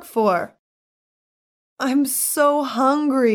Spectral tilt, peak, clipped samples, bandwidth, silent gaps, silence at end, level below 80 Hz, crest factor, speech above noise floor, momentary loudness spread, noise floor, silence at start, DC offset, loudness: -3.5 dB/octave; -6 dBFS; under 0.1%; 18 kHz; 0.59-1.76 s; 0 s; -74 dBFS; 16 dB; over 71 dB; 7 LU; under -90 dBFS; 0 s; under 0.1%; -19 LUFS